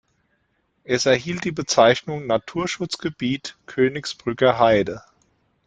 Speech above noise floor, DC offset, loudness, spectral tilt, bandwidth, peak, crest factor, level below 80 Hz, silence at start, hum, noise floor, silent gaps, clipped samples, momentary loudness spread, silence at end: 48 dB; under 0.1%; -21 LUFS; -4.5 dB/octave; 9.4 kHz; -2 dBFS; 20 dB; -56 dBFS; 0.9 s; none; -69 dBFS; none; under 0.1%; 12 LU; 0.65 s